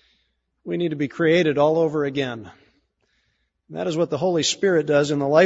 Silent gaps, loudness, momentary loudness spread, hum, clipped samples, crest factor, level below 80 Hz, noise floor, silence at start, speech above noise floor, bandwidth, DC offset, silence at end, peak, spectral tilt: none; -21 LUFS; 11 LU; none; under 0.1%; 18 dB; -64 dBFS; -70 dBFS; 0.65 s; 50 dB; 8 kHz; under 0.1%; 0 s; -4 dBFS; -5 dB/octave